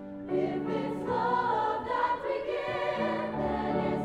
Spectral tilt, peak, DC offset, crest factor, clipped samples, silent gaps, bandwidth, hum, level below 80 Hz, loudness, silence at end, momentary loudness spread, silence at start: -7 dB/octave; -16 dBFS; under 0.1%; 14 dB; under 0.1%; none; 11.5 kHz; none; -56 dBFS; -30 LUFS; 0 s; 5 LU; 0 s